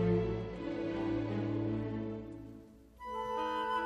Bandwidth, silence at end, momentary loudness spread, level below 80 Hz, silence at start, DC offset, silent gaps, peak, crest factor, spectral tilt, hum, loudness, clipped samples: 12 kHz; 0 s; 15 LU; -54 dBFS; 0 s; under 0.1%; none; -20 dBFS; 16 dB; -8 dB/octave; none; -37 LUFS; under 0.1%